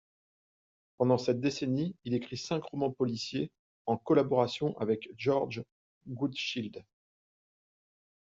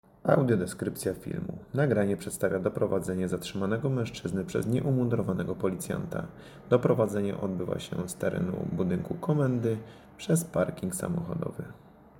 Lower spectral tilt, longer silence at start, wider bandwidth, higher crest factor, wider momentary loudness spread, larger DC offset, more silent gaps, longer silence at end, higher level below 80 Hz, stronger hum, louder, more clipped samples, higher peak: about the same, -6 dB/octave vs -6.5 dB/octave; first, 1 s vs 0.25 s; second, 7.8 kHz vs 17 kHz; about the same, 20 dB vs 22 dB; first, 13 LU vs 10 LU; neither; first, 3.59-3.85 s, 5.72-6.01 s vs none; first, 1.55 s vs 0 s; second, -70 dBFS vs -56 dBFS; neither; about the same, -32 LUFS vs -30 LUFS; neither; second, -12 dBFS vs -8 dBFS